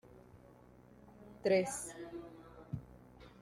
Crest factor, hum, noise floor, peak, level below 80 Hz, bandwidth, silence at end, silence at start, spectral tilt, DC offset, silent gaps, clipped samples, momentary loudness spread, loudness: 20 dB; none; -61 dBFS; -20 dBFS; -66 dBFS; 15.5 kHz; 0.05 s; 0.1 s; -4.5 dB/octave; under 0.1%; none; under 0.1%; 27 LU; -38 LUFS